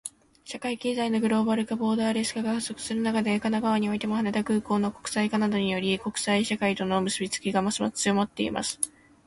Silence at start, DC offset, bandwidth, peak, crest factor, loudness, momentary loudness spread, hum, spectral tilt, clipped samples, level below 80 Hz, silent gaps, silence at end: 0.05 s; under 0.1%; 11.5 kHz; -10 dBFS; 18 dB; -27 LUFS; 4 LU; none; -4 dB/octave; under 0.1%; -60 dBFS; none; 0.4 s